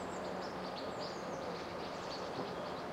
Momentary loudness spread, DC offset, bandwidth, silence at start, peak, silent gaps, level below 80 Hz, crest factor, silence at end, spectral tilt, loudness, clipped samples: 1 LU; under 0.1%; 16 kHz; 0 s; -28 dBFS; none; -68 dBFS; 14 dB; 0 s; -4.5 dB/octave; -42 LUFS; under 0.1%